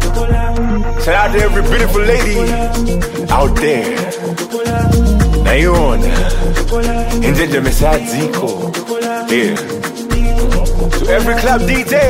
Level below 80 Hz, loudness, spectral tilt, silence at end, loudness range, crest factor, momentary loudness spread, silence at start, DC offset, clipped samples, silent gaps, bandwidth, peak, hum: -14 dBFS; -14 LUFS; -5.5 dB/octave; 0 s; 2 LU; 12 dB; 7 LU; 0 s; under 0.1%; under 0.1%; none; 16.5 kHz; 0 dBFS; none